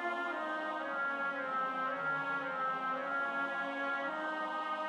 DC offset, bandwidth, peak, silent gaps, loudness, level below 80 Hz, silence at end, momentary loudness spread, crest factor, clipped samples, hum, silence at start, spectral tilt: under 0.1%; 10.5 kHz; -26 dBFS; none; -36 LUFS; -84 dBFS; 0 s; 2 LU; 12 dB; under 0.1%; none; 0 s; -4.5 dB/octave